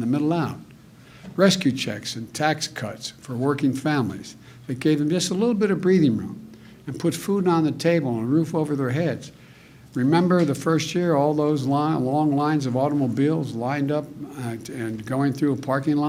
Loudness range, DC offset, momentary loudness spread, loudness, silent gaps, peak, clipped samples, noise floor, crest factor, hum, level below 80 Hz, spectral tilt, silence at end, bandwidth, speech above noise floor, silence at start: 3 LU; under 0.1%; 13 LU; -23 LUFS; none; -4 dBFS; under 0.1%; -48 dBFS; 18 dB; none; -62 dBFS; -6 dB/octave; 0 s; 16 kHz; 25 dB; 0 s